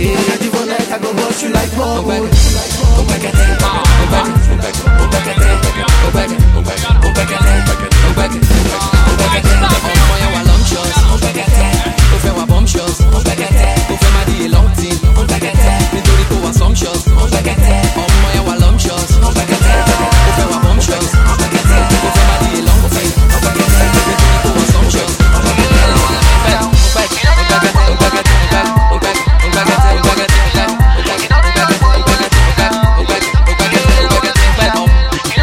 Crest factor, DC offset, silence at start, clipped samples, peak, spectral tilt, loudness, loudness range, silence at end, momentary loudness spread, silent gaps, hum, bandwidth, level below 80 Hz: 10 dB; under 0.1%; 0 s; 0.2%; 0 dBFS; -4.5 dB/octave; -11 LUFS; 2 LU; 0 s; 3 LU; none; none; 16 kHz; -12 dBFS